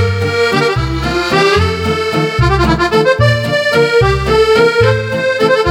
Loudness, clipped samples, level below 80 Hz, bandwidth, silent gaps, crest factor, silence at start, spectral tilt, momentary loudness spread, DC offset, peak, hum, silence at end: -12 LUFS; under 0.1%; -26 dBFS; 16 kHz; none; 12 dB; 0 s; -5.5 dB/octave; 5 LU; under 0.1%; 0 dBFS; none; 0 s